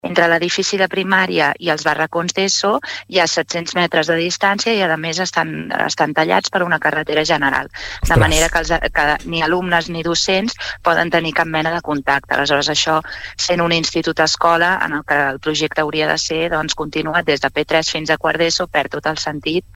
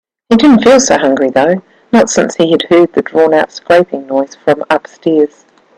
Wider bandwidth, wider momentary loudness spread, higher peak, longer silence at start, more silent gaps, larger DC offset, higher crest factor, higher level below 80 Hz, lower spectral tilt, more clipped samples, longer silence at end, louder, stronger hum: first, 16.5 kHz vs 11.5 kHz; about the same, 6 LU vs 8 LU; about the same, -2 dBFS vs 0 dBFS; second, 0.05 s vs 0.3 s; neither; neither; first, 16 dB vs 10 dB; first, -36 dBFS vs -48 dBFS; about the same, -3.5 dB/octave vs -4.5 dB/octave; neither; second, 0.15 s vs 0.5 s; second, -16 LUFS vs -10 LUFS; neither